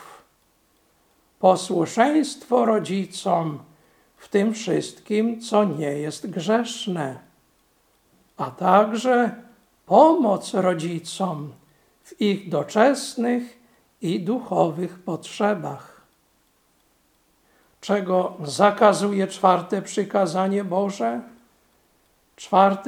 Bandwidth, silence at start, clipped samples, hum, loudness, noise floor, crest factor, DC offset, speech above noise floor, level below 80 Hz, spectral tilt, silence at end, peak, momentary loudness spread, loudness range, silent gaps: 16 kHz; 0 s; under 0.1%; none; -22 LUFS; -64 dBFS; 22 dB; under 0.1%; 43 dB; -72 dBFS; -5.5 dB/octave; 0 s; 0 dBFS; 13 LU; 7 LU; none